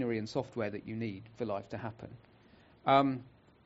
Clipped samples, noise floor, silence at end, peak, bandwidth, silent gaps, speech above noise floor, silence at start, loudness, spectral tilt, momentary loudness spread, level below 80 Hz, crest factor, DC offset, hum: under 0.1%; -61 dBFS; 0.35 s; -12 dBFS; 7.6 kHz; none; 27 dB; 0 s; -35 LUFS; -5 dB/octave; 16 LU; -68 dBFS; 24 dB; under 0.1%; none